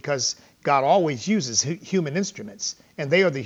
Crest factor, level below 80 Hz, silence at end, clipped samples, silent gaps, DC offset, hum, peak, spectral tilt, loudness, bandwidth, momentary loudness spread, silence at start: 16 dB; -68 dBFS; 0 s; under 0.1%; none; under 0.1%; none; -6 dBFS; -3.5 dB/octave; -23 LUFS; 8.2 kHz; 11 LU; 0.05 s